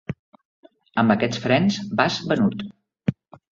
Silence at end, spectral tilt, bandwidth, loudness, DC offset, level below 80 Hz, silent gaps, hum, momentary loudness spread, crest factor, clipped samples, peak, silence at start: 0.4 s; -6 dB/octave; 7.4 kHz; -22 LUFS; under 0.1%; -56 dBFS; 0.19-0.32 s, 0.45-0.63 s; none; 16 LU; 20 dB; under 0.1%; -2 dBFS; 0.1 s